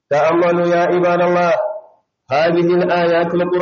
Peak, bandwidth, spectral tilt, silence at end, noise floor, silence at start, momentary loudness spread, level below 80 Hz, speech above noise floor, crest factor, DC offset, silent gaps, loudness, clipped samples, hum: -6 dBFS; 6.8 kHz; -5 dB/octave; 0 s; -48 dBFS; 0.1 s; 5 LU; -60 dBFS; 34 dB; 10 dB; under 0.1%; none; -15 LUFS; under 0.1%; none